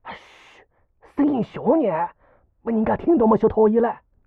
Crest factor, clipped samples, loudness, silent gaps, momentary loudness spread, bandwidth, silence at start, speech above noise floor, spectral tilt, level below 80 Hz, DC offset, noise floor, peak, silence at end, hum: 16 dB; under 0.1%; -20 LUFS; none; 16 LU; 4.5 kHz; 0.05 s; 37 dB; -10 dB/octave; -50 dBFS; under 0.1%; -56 dBFS; -6 dBFS; 0.3 s; none